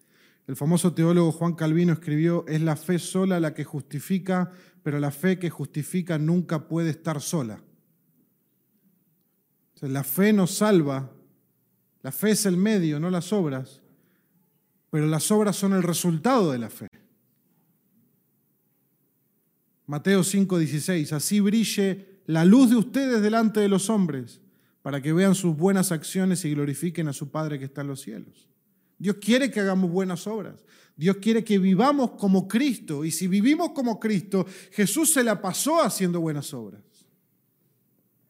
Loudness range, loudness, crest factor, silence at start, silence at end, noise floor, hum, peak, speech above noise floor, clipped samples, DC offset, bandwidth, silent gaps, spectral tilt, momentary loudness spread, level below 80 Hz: 7 LU; -24 LUFS; 18 dB; 0.5 s; 1.55 s; -70 dBFS; none; -6 dBFS; 46 dB; under 0.1%; under 0.1%; 16 kHz; 16.88-16.92 s; -5.5 dB/octave; 13 LU; -76 dBFS